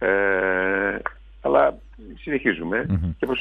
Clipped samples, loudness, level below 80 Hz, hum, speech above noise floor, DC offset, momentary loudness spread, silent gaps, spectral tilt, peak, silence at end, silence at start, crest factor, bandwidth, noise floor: under 0.1%; -22 LUFS; -42 dBFS; none; 18 dB; under 0.1%; 11 LU; none; -8.5 dB/octave; -4 dBFS; 0 s; 0 s; 20 dB; 4.4 kHz; -42 dBFS